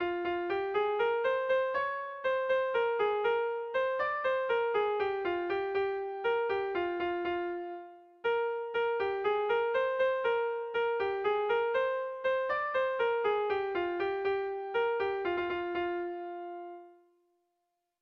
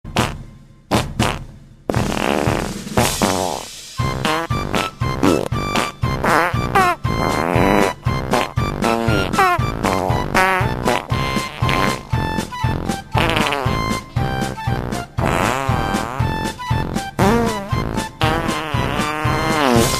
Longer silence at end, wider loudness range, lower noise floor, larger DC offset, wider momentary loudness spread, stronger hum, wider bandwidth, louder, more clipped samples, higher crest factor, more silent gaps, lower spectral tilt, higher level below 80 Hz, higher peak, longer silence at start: first, 1.1 s vs 0 s; about the same, 3 LU vs 3 LU; first, -82 dBFS vs -40 dBFS; neither; about the same, 6 LU vs 7 LU; neither; second, 6.4 kHz vs 15 kHz; second, -32 LUFS vs -19 LUFS; neither; second, 12 dB vs 18 dB; neither; about the same, -6 dB/octave vs -5 dB/octave; second, -68 dBFS vs -32 dBFS; second, -20 dBFS vs 0 dBFS; about the same, 0 s vs 0.05 s